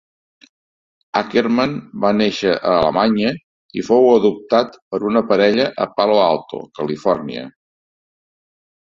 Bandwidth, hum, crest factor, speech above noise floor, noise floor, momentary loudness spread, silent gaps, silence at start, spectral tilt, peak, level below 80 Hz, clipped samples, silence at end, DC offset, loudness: 7.4 kHz; none; 18 dB; over 74 dB; under -90 dBFS; 12 LU; 3.44-3.69 s, 4.82-4.91 s; 1.15 s; -6 dB/octave; 0 dBFS; -54 dBFS; under 0.1%; 1.5 s; under 0.1%; -17 LUFS